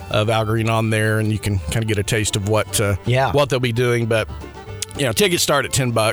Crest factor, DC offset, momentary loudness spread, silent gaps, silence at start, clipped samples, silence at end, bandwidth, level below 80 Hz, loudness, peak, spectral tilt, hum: 16 dB; under 0.1%; 6 LU; none; 0 s; under 0.1%; 0 s; over 20 kHz; -40 dBFS; -19 LUFS; -4 dBFS; -4.5 dB/octave; none